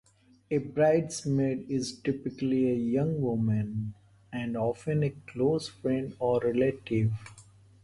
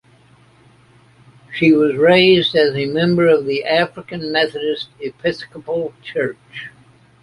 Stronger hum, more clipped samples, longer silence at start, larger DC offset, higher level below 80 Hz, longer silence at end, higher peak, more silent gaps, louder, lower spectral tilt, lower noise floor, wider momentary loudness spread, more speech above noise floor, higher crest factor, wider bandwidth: neither; neither; second, 0.5 s vs 1.5 s; neither; about the same, -58 dBFS vs -54 dBFS; second, 0.4 s vs 0.55 s; second, -14 dBFS vs -2 dBFS; neither; second, -29 LUFS vs -16 LUFS; about the same, -7 dB/octave vs -7 dB/octave; first, -55 dBFS vs -50 dBFS; second, 9 LU vs 17 LU; second, 27 dB vs 34 dB; about the same, 16 dB vs 16 dB; about the same, 11.5 kHz vs 11 kHz